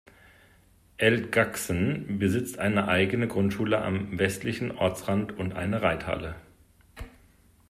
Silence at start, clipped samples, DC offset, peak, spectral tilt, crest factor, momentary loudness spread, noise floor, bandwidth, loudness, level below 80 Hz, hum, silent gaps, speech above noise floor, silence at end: 1 s; under 0.1%; under 0.1%; -8 dBFS; -5.5 dB/octave; 20 dB; 10 LU; -59 dBFS; 15.5 kHz; -27 LUFS; -54 dBFS; none; none; 33 dB; 0.6 s